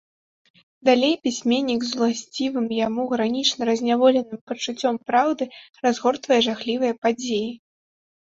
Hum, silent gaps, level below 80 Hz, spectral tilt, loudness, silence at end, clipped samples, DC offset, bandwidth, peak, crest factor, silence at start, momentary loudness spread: none; 4.41-4.47 s, 6.98-7.02 s; -66 dBFS; -3.5 dB/octave; -22 LUFS; 0.75 s; under 0.1%; under 0.1%; 7.8 kHz; -4 dBFS; 18 dB; 0.85 s; 8 LU